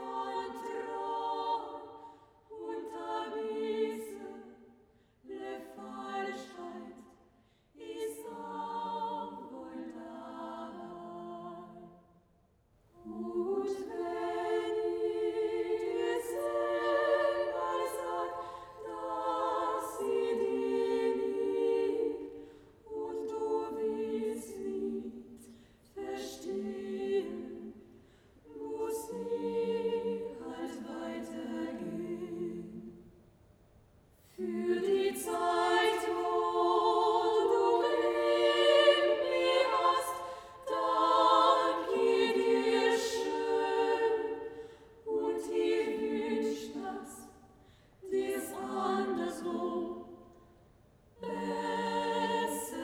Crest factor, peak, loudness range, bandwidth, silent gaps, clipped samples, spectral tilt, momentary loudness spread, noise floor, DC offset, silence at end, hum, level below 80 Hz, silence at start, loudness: 22 dB; -12 dBFS; 13 LU; 17.5 kHz; none; under 0.1%; -4 dB/octave; 17 LU; -69 dBFS; under 0.1%; 0 s; none; -70 dBFS; 0 s; -33 LUFS